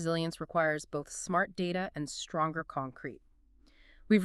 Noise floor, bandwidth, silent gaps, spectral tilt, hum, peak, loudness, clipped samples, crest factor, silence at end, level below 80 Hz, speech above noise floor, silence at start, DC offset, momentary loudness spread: -63 dBFS; 12.5 kHz; none; -5 dB/octave; none; -12 dBFS; -34 LUFS; under 0.1%; 20 dB; 0 s; -62 dBFS; 29 dB; 0 s; under 0.1%; 8 LU